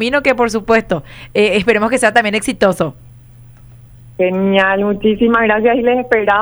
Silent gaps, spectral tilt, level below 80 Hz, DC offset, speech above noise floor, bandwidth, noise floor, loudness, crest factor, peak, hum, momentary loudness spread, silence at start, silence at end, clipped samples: none; -5 dB/octave; -42 dBFS; under 0.1%; 26 dB; over 20 kHz; -39 dBFS; -14 LUFS; 14 dB; 0 dBFS; none; 8 LU; 0 s; 0 s; under 0.1%